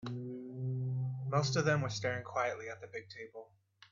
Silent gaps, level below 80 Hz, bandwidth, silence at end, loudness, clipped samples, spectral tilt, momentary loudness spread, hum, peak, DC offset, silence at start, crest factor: none; -72 dBFS; 7.4 kHz; 0.5 s; -36 LUFS; under 0.1%; -5.5 dB/octave; 16 LU; none; -18 dBFS; under 0.1%; 0 s; 20 dB